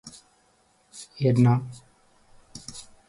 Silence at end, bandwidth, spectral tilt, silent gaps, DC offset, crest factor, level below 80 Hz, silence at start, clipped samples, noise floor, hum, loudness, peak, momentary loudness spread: 0.25 s; 11.5 kHz; -7.5 dB/octave; none; under 0.1%; 20 dB; -62 dBFS; 0.05 s; under 0.1%; -64 dBFS; none; -23 LUFS; -8 dBFS; 26 LU